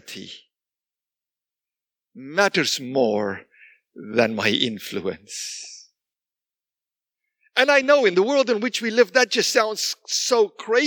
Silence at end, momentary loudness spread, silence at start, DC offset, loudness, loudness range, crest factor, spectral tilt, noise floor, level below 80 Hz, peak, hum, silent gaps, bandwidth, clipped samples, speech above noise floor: 0 s; 14 LU; 0.1 s; under 0.1%; -21 LUFS; 7 LU; 22 dB; -2.5 dB/octave; -90 dBFS; -74 dBFS; -2 dBFS; none; none; 19 kHz; under 0.1%; 69 dB